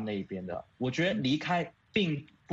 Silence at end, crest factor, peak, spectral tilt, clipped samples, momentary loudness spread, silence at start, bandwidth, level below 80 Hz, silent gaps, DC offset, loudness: 0 s; 18 dB; -14 dBFS; -6 dB/octave; under 0.1%; 10 LU; 0 s; 8 kHz; -66 dBFS; none; under 0.1%; -32 LUFS